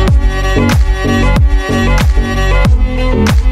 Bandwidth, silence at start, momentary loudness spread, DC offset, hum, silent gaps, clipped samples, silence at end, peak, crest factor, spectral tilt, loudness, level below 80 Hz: 14 kHz; 0 s; 2 LU; under 0.1%; none; none; under 0.1%; 0 s; 0 dBFS; 8 dB; -6 dB/octave; -12 LUFS; -12 dBFS